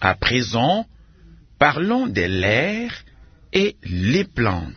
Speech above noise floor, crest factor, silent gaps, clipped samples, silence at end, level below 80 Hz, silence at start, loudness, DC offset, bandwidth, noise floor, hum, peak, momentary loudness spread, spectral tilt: 28 dB; 20 dB; none; under 0.1%; 0 s; -44 dBFS; 0 s; -20 LUFS; under 0.1%; 6.6 kHz; -47 dBFS; none; 0 dBFS; 7 LU; -5.5 dB/octave